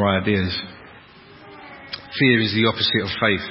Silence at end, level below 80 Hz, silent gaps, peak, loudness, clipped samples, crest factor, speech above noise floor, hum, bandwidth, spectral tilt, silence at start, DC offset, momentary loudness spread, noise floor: 0 s; -44 dBFS; none; -2 dBFS; -19 LUFS; under 0.1%; 18 dB; 26 dB; none; 5.8 kHz; -9.5 dB/octave; 0 s; under 0.1%; 21 LU; -45 dBFS